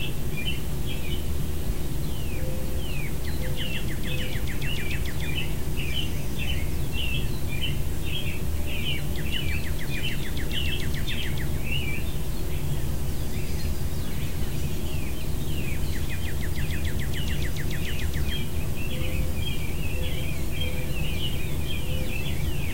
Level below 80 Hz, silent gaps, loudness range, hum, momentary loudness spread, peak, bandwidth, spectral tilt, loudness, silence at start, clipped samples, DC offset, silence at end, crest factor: -32 dBFS; none; 2 LU; none; 3 LU; -12 dBFS; 16 kHz; -4.5 dB/octave; -30 LUFS; 0 s; under 0.1%; 5%; 0 s; 14 dB